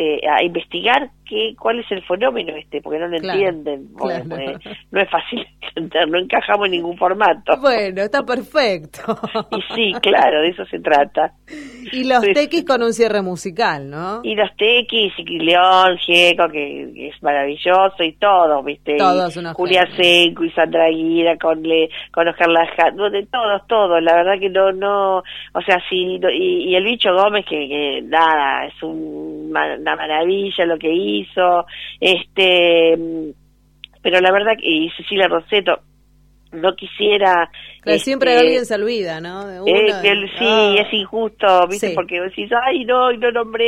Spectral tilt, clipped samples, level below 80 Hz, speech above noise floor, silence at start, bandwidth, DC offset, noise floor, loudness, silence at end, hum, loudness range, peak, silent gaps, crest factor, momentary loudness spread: -4 dB/octave; under 0.1%; -54 dBFS; 36 dB; 0 s; 14.5 kHz; under 0.1%; -52 dBFS; -16 LUFS; 0 s; 50 Hz at -55 dBFS; 5 LU; 0 dBFS; none; 16 dB; 12 LU